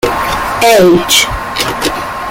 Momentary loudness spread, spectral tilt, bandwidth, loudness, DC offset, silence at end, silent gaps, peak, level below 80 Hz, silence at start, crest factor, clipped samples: 9 LU; -3 dB/octave; 17.5 kHz; -10 LUFS; under 0.1%; 0 s; none; 0 dBFS; -32 dBFS; 0.05 s; 10 dB; under 0.1%